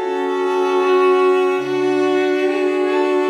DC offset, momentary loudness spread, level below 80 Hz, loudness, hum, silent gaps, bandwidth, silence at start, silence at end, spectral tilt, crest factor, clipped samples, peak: under 0.1%; 5 LU; -80 dBFS; -17 LUFS; none; none; 10.5 kHz; 0 s; 0 s; -4.5 dB/octave; 10 dB; under 0.1%; -6 dBFS